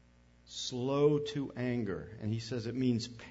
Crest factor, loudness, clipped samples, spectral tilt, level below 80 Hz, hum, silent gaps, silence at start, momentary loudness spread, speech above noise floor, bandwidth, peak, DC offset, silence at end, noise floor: 18 dB; -34 LUFS; under 0.1%; -6 dB/octave; -62 dBFS; 60 Hz at -55 dBFS; none; 0.5 s; 10 LU; 29 dB; 8 kHz; -16 dBFS; under 0.1%; 0 s; -62 dBFS